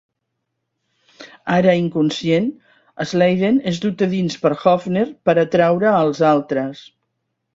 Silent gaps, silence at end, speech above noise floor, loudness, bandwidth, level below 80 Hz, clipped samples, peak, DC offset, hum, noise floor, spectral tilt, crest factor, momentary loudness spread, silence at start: none; 0.75 s; 59 dB; -17 LUFS; 7.8 kHz; -58 dBFS; under 0.1%; -2 dBFS; under 0.1%; none; -76 dBFS; -6.5 dB/octave; 18 dB; 8 LU; 1.2 s